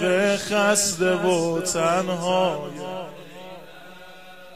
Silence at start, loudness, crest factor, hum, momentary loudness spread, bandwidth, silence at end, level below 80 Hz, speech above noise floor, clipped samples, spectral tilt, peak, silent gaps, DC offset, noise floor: 0 s; -22 LUFS; 16 dB; none; 23 LU; 15.5 kHz; 0 s; -60 dBFS; 22 dB; under 0.1%; -3.5 dB/octave; -6 dBFS; none; 0.4%; -44 dBFS